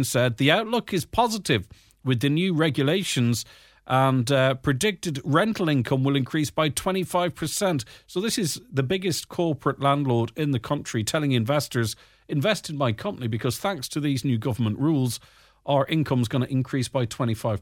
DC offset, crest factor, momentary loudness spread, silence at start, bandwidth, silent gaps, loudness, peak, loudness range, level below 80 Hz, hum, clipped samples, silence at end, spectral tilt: under 0.1%; 20 dB; 6 LU; 0 s; 17.5 kHz; none; -24 LUFS; -6 dBFS; 3 LU; -54 dBFS; none; under 0.1%; 0 s; -5 dB/octave